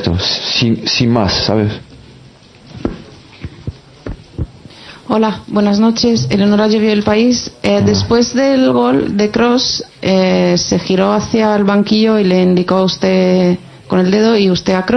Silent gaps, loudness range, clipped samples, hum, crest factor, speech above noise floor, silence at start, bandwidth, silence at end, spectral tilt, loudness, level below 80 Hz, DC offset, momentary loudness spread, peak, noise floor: none; 9 LU; under 0.1%; none; 12 dB; 29 dB; 0 s; 9.8 kHz; 0 s; -5.5 dB/octave; -12 LUFS; -38 dBFS; under 0.1%; 16 LU; 0 dBFS; -40 dBFS